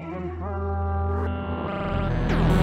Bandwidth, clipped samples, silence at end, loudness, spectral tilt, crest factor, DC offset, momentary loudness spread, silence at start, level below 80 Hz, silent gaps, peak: 8.6 kHz; under 0.1%; 0 s; -27 LUFS; -8 dB/octave; 18 dB; under 0.1%; 8 LU; 0 s; -32 dBFS; none; -6 dBFS